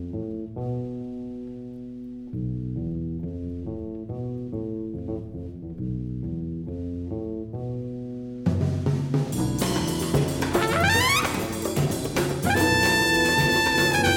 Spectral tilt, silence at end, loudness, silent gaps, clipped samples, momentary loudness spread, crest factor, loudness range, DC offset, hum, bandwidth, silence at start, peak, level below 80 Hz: -4.5 dB/octave; 0 s; -25 LUFS; none; under 0.1%; 15 LU; 18 dB; 12 LU; under 0.1%; none; 17.5 kHz; 0 s; -6 dBFS; -44 dBFS